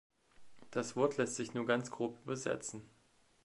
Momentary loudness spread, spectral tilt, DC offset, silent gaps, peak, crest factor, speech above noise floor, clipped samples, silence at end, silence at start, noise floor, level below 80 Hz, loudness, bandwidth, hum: 8 LU; -4.5 dB/octave; under 0.1%; none; -18 dBFS; 22 dB; 21 dB; under 0.1%; 0.55 s; 0.4 s; -58 dBFS; -76 dBFS; -38 LUFS; 11.5 kHz; none